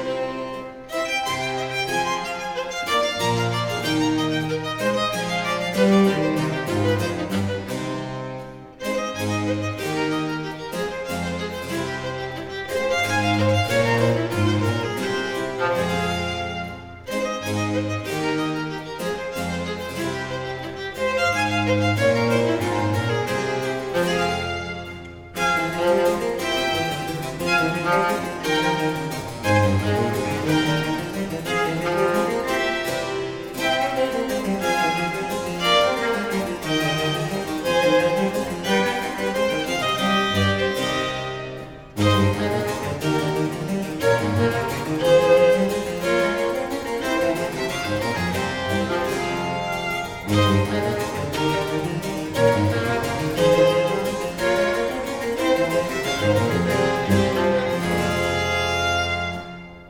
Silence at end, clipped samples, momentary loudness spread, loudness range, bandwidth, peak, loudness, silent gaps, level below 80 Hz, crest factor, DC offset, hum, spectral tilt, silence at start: 0 s; under 0.1%; 9 LU; 5 LU; 18.5 kHz; -6 dBFS; -22 LUFS; none; -48 dBFS; 16 dB; under 0.1%; none; -5 dB/octave; 0 s